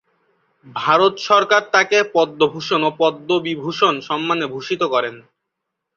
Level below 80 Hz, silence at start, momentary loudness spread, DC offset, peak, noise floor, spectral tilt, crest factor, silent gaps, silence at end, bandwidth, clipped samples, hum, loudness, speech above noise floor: -66 dBFS; 0.65 s; 8 LU; under 0.1%; -2 dBFS; -79 dBFS; -4 dB/octave; 18 dB; none; 0.75 s; 7.2 kHz; under 0.1%; none; -17 LUFS; 61 dB